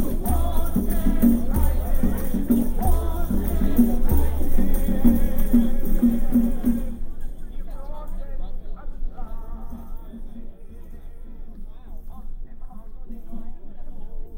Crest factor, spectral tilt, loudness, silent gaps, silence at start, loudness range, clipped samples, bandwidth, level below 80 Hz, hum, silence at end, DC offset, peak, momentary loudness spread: 18 dB; -7.5 dB/octave; -23 LUFS; none; 0 s; 20 LU; under 0.1%; 17 kHz; -24 dBFS; none; 0 s; under 0.1%; -2 dBFS; 23 LU